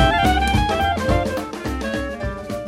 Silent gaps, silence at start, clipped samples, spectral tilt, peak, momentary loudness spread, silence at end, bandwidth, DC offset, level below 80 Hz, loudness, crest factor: none; 0 s; under 0.1%; -5.5 dB/octave; -4 dBFS; 10 LU; 0 s; 16.5 kHz; under 0.1%; -28 dBFS; -21 LUFS; 16 dB